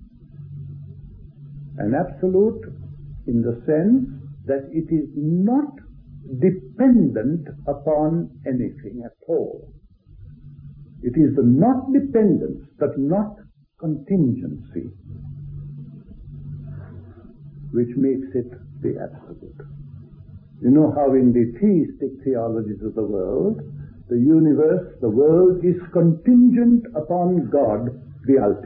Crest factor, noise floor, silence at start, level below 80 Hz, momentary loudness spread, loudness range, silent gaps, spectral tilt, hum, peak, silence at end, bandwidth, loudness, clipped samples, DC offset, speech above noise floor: 16 dB; -44 dBFS; 0 s; -48 dBFS; 22 LU; 11 LU; none; -14.5 dB/octave; none; -4 dBFS; 0 s; 2.7 kHz; -20 LUFS; under 0.1%; under 0.1%; 26 dB